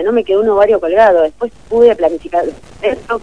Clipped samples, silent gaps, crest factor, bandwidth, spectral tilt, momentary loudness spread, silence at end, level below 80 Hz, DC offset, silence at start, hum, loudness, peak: 0.3%; none; 12 dB; 9.8 kHz; -6 dB/octave; 9 LU; 0.05 s; -42 dBFS; 0.8%; 0 s; none; -12 LUFS; 0 dBFS